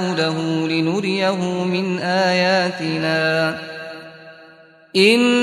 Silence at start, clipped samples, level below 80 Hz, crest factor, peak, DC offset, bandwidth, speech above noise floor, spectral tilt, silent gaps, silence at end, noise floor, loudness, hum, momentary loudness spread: 0 s; under 0.1%; -64 dBFS; 18 dB; 0 dBFS; under 0.1%; 13.5 kHz; 29 dB; -5 dB/octave; none; 0 s; -47 dBFS; -18 LUFS; none; 16 LU